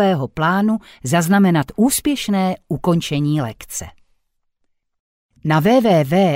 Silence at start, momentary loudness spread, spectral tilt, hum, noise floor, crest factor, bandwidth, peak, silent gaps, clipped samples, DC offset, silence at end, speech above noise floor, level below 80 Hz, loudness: 0 s; 11 LU; -5.5 dB/octave; none; -68 dBFS; 14 dB; 16 kHz; -4 dBFS; 5.00-5.29 s; under 0.1%; under 0.1%; 0 s; 51 dB; -48 dBFS; -17 LUFS